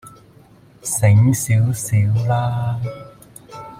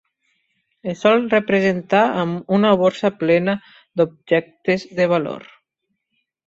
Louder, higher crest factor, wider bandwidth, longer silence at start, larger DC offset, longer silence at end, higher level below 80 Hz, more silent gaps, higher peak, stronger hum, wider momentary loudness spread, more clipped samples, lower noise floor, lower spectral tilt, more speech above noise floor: about the same, -18 LUFS vs -19 LUFS; about the same, 16 dB vs 18 dB; first, 16 kHz vs 7.8 kHz; second, 0.05 s vs 0.85 s; neither; second, 0 s vs 1.1 s; first, -48 dBFS vs -60 dBFS; neither; about the same, -2 dBFS vs -2 dBFS; neither; first, 19 LU vs 12 LU; neither; second, -48 dBFS vs -75 dBFS; about the same, -6 dB/octave vs -7 dB/octave; second, 31 dB vs 57 dB